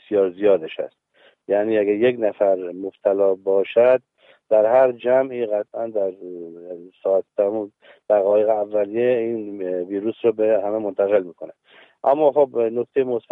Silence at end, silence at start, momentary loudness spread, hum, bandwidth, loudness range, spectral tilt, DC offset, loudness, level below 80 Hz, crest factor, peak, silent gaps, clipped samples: 0.15 s; 0.1 s; 14 LU; none; 3.9 kHz; 3 LU; -8.5 dB/octave; under 0.1%; -20 LUFS; -72 dBFS; 16 dB; -4 dBFS; none; under 0.1%